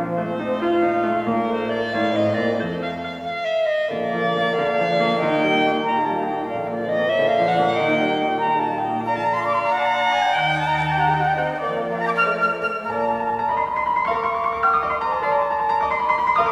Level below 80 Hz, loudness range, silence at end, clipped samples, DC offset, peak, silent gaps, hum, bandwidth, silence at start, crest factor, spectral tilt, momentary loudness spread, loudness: -54 dBFS; 2 LU; 0 s; under 0.1%; under 0.1%; -8 dBFS; none; none; 12 kHz; 0 s; 14 dB; -6 dB/octave; 5 LU; -21 LUFS